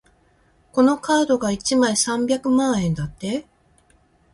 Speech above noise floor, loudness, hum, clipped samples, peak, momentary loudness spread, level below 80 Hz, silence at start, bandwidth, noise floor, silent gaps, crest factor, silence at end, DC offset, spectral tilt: 39 dB; -20 LUFS; none; under 0.1%; -4 dBFS; 9 LU; -50 dBFS; 0.75 s; 11.5 kHz; -59 dBFS; none; 16 dB; 0.9 s; under 0.1%; -4.5 dB/octave